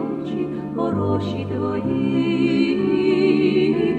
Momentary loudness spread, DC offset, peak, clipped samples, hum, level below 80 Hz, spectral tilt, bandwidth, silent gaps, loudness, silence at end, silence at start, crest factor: 8 LU; under 0.1%; -6 dBFS; under 0.1%; none; -52 dBFS; -8 dB/octave; 8.6 kHz; none; -20 LUFS; 0 s; 0 s; 14 dB